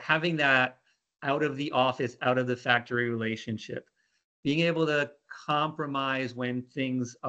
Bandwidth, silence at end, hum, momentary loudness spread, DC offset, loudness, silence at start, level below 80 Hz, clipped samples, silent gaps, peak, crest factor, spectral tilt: 8.4 kHz; 0 s; none; 11 LU; under 0.1%; -28 LUFS; 0 s; -72 dBFS; under 0.1%; 4.24-4.43 s; -6 dBFS; 22 dB; -5.5 dB/octave